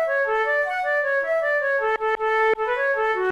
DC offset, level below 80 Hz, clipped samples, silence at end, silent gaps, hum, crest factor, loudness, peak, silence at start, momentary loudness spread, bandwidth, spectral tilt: 0.1%; -58 dBFS; under 0.1%; 0 s; none; none; 10 dB; -22 LUFS; -12 dBFS; 0 s; 2 LU; 12.5 kHz; -3.5 dB/octave